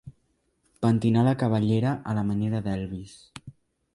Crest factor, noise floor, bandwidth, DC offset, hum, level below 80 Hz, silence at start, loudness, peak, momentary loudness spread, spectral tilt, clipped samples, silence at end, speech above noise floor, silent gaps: 16 dB; -71 dBFS; 11.5 kHz; under 0.1%; none; -54 dBFS; 0.05 s; -25 LUFS; -10 dBFS; 22 LU; -8.5 dB/octave; under 0.1%; 0.45 s; 46 dB; none